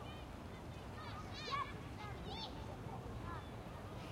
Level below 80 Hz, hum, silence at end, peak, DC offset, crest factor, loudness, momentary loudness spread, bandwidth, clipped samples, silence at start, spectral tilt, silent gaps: -56 dBFS; none; 0 s; -30 dBFS; under 0.1%; 18 dB; -48 LUFS; 8 LU; 16 kHz; under 0.1%; 0 s; -5.5 dB/octave; none